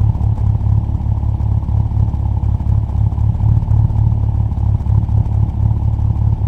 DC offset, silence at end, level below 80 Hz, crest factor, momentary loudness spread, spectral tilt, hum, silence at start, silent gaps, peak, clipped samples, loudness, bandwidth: under 0.1%; 0 s; -18 dBFS; 12 dB; 3 LU; -11 dB/octave; none; 0 s; none; 0 dBFS; under 0.1%; -16 LUFS; 1.9 kHz